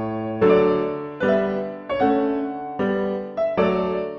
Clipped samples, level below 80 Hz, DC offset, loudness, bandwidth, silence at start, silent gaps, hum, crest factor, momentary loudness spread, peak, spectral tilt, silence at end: under 0.1%; -52 dBFS; under 0.1%; -22 LUFS; 6.4 kHz; 0 s; none; none; 16 dB; 9 LU; -6 dBFS; -9 dB/octave; 0 s